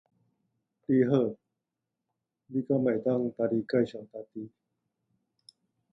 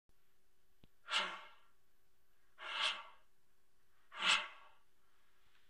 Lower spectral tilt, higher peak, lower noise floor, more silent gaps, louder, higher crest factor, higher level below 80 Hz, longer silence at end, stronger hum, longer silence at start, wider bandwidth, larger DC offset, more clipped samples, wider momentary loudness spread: first, -9.5 dB/octave vs 1 dB/octave; first, -12 dBFS vs -18 dBFS; first, -87 dBFS vs -81 dBFS; neither; first, -29 LUFS vs -37 LUFS; second, 20 dB vs 26 dB; first, -74 dBFS vs -82 dBFS; first, 1.45 s vs 1.05 s; neither; second, 0.9 s vs 1.05 s; second, 6 kHz vs 15.5 kHz; neither; neither; about the same, 18 LU vs 19 LU